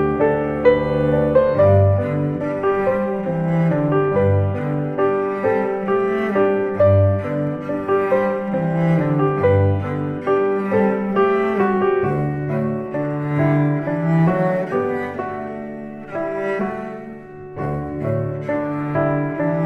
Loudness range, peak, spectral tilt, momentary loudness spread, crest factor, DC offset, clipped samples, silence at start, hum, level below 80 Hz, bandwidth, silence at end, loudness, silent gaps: 6 LU; -2 dBFS; -10 dB/octave; 9 LU; 16 dB; under 0.1%; under 0.1%; 0 s; none; -46 dBFS; 5.8 kHz; 0 s; -19 LUFS; none